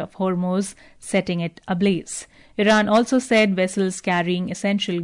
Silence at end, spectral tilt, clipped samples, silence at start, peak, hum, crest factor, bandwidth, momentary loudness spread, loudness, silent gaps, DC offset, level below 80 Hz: 0 s; -5 dB/octave; under 0.1%; 0 s; -6 dBFS; none; 14 dB; 11 kHz; 11 LU; -21 LUFS; none; under 0.1%; -58 dBFS